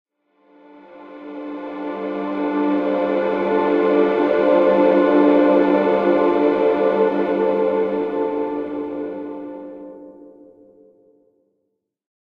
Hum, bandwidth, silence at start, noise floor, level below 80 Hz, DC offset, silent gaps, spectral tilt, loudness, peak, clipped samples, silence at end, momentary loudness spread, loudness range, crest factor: none; 5.2 kHz; 0.9 s; -74 dBFS; -62 dBFS; under 0.1%; none; -8.5 dB/octave; -18 LUFS; -4 dBFS; under 0.1%; 2.05 s; 17 LU; 14 LU; 16 dB